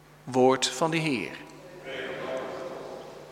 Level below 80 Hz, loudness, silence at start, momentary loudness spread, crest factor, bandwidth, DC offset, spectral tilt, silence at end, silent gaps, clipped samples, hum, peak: -66 dBFS; -28 LUFS; 0.1 s; 20 LU; 20 dB; 16 kHz; under 0.1%; -4 dB/octave; 0 s; none; under 0.1%; none; -10 dBFS